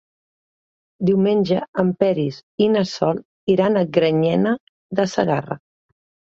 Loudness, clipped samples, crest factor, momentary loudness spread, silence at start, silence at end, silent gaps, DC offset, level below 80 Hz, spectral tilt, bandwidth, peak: -20 LUFS; under 0.1%; 18 dB; 9 LU; 1 s; 0.7 s; 1.68-1.73 s, 2.43-2.58 s, 3.25-3.47 s, 4.60-4.90 s; under 0.1%; -60 dBFS; -7 dB/octave; 7.6 kHz; -2 dBFS